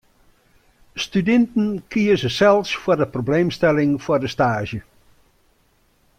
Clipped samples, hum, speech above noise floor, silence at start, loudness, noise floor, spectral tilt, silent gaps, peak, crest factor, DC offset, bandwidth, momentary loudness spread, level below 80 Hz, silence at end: under 0.1%; none; 42 dB; 0.95 s; -19 LUFS; -61 dBFS; -6 dB/octave; none; -4 dBFS; 16 dB; under 0.1%; 15 kHz; 10 LU; -50 dBFS; 1.4 s